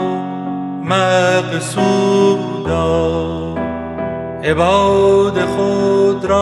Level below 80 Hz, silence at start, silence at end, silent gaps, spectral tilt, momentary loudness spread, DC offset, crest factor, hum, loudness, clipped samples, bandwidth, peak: -38 dBFS; 0 s; 0 s; none; -5.5 dB/octave; 11 LU; under 0.1%; 14 dB; none; -15 LUFS; under 0.1%; 12 kHz; 0 dBFS